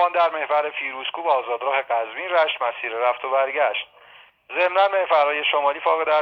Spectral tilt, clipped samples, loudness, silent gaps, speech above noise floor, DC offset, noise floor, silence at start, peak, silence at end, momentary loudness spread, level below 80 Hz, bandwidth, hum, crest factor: -3.5 dB/octave; under 0.1%; -21 LUFS; none; 29 dB; under 0.1%; -50 dBFS; 0 s; -6 dBFS; 0 s; 8 LU; -76 dBFS; 6 kHz; none; 16 dB